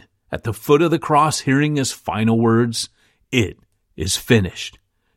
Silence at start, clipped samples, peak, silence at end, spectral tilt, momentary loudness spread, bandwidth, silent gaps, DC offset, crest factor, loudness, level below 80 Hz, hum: 0.3 s; under 0.1%; -2 dBFS; 0.45 s; -5 dB/octave; 12 LU; 16.5 kHz; none; under 0.1%; 18 dB; -19 LUFS; -48 dBFS; none